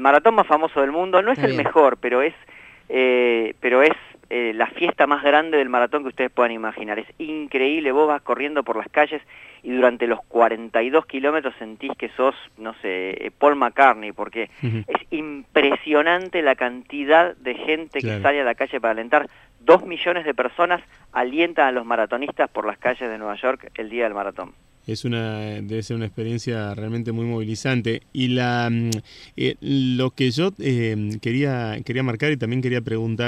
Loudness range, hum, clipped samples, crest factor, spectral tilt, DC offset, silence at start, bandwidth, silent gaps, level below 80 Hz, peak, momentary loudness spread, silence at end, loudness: 6 LU; none; under 0.1%; 20 dB; -6 dB/octave; under 0.1%; 0 s; 13.5 kHz; none; -58 dBFS; -2 dBFS; 12 LU; 0 s; -21 LUFS